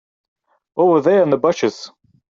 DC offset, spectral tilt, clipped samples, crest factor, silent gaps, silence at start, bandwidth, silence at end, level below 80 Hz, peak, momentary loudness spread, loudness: under 0.1%; -6 dB/octave; under 0.1%; 14 dB; none; 0.75 s; 7.6 kHz; 0.45 s; -64 dBFS; -4 dBFS; 19 LU; -16 LUFS